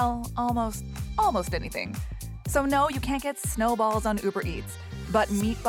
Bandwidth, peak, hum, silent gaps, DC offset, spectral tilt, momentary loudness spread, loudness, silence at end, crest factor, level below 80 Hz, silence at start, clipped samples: 17.5 kHz; -10 dBFS; none; none; under 0.1%; -5 dB/octave; 11 LU; -28 LUFS; 0 s; 18 dB; -40 dBFS; 0 s; under 0.1%